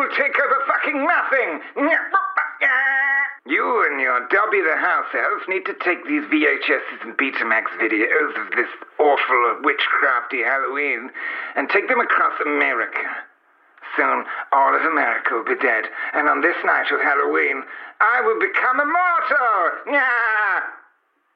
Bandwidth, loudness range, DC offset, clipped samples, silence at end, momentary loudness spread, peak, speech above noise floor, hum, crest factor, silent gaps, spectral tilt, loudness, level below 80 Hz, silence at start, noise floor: 6.2 kHz; 2 LU; under 0.1%; under 0.1%; 0.55 s; 6 LU; -6 dBFS; 42 dB; none; 14 dB; none; -4.5 dB/octave; -19 LUFS; -76 dBFS; 0 s; -62 dBFS